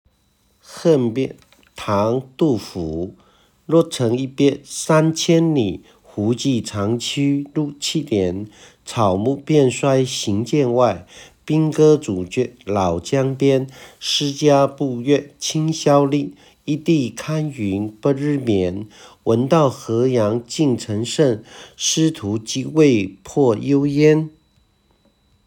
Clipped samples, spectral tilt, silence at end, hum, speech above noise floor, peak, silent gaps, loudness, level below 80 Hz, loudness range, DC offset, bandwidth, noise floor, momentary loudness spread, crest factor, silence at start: under 0.1%; -5.5 dB/octave; 1.15 s; none; 43 dB; -2 dBFS; none; -19 LUFS; -54 dBFS; 3 LU; under 0.1%; 17.5 kHz; -61 dBFS; 11 LU; 18 dB; 0.7 s